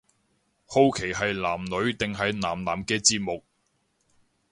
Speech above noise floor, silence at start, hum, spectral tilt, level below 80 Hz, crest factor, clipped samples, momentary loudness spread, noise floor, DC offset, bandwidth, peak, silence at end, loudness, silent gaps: 46 dB; 0.7 s; none; -3 dB/octave; -54 dBFS; 22 dB; under 0.1%; 8 LU; -72 dBFS; under 0.1%; 11.5 kHz; -6 dBFS; 1.1 s; -25 LUFS; none